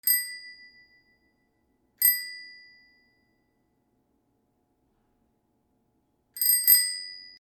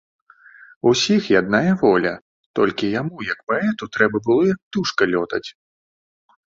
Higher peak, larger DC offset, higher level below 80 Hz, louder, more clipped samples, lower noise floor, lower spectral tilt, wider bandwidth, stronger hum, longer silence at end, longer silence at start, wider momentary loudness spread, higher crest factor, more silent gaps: about the same, -4 dBFS vs -2 dBFS; neither; second, -76 dBFS vs -56 dBFS; about the same, -21 LUFS vs -19 LUFS; neither; first, -72 dBFS vs -47 dBFS; second, 4.5 dB/octave vs -5 dB/octave; first, 19.5 kHz vs 7.8 kHz; neither; second, 0.1 s vs 0.95 s; second, 0.05 s vs 0.85 s; first, 24 LU vs 10 LU; first, 26 dB vs 18 dB; second, none vs 2.21-2.54 s, 3.43-3.47 s, 4.62-4.71 s